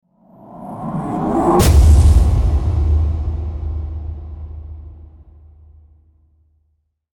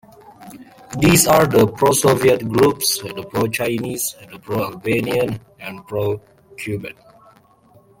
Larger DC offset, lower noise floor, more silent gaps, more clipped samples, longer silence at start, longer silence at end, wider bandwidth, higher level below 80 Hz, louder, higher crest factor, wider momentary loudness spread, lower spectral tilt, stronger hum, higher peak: neither; first, -66 dBFS vs -52 dBFS; neither; neither; about the same, 0.5 s vs 0.4 s; first, 2.25 s vs 1.1 s; about the same, 18 kHz vs 17 kHz; first, -18 dBFS vs -48 dBFS; about the same, -16 LUFS vs -18 LUFS; about the same, 16 dB vs 18 dB; first, 22 LU vs 17 LU; first, -7 dB/octave vs -4.5 dB/octave; neither; about the same, -2 dBFS vs 0 dBFS